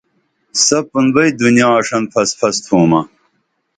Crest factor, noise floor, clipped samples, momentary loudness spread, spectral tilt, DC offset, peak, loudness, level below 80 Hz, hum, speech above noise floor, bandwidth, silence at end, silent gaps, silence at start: 14 dB; -65 dBFS; under 0.1%; 6 LU; -4 dB/octave; under 0.1%; 0 dBFS; -13 LUFS; -54 dBFS; none; 52 dB; 9.6 kHz; 0.7 s; none; 0.55 s